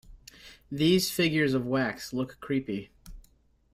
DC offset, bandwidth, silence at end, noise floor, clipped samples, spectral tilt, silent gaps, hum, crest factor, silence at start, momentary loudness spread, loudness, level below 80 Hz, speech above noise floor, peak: under 0.1%; 16 kHz; 0.55 s; -64 dBFS; under 0.1%; -5 dB/octave; none; none; 18 dB; 0.1 s; 15 LU; -28 LUFS; -56 dBFS; 36 dB; -12 dBFS